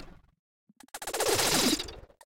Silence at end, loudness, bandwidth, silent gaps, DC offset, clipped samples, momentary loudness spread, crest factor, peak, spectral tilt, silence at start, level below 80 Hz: 0.2 s; -27 LUFS; 16.5 kHz; 0.39-0.67 s; under 0.1%; under 0.1%; 17 LU; 20 dB; -12 dBFS; -2 dB/octave; 0 s; -54 dBFS